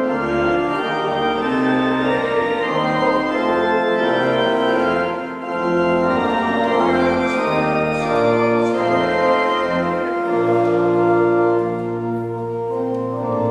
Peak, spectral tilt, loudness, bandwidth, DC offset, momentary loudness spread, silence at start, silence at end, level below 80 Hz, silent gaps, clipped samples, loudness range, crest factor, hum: -4 dBFS; -6.5 dB/octave; -18 LUFS; 10 kHz; under 0.1%; 7 LU; 0 s; 0 s; -50 dBFS; none; under 0.1%; 1 LU; 14 dB; none